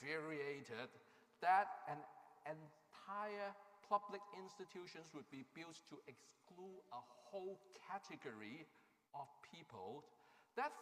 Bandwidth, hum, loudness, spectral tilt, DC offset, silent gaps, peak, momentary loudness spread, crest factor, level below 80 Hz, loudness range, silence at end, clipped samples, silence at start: 15.5 kHz; none; -49 LUFS; -4.5 dB/octave; under 0.1%; none; -26 dBFS; 18 LU; 24 dB; under -90 dBFS; 11 LU; 0 s; under 0.1%; 0 s